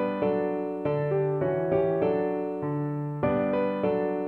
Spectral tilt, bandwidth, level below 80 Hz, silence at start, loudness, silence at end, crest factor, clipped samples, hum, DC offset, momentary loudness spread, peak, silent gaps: -10.5 dB/octave; 4.3 kHz; -56 dBFS; 0 s; -27 LUFS; 0 s; 14 dB; under 0.1%; none; under 0.1%; 5 LU; -12 dBFS; none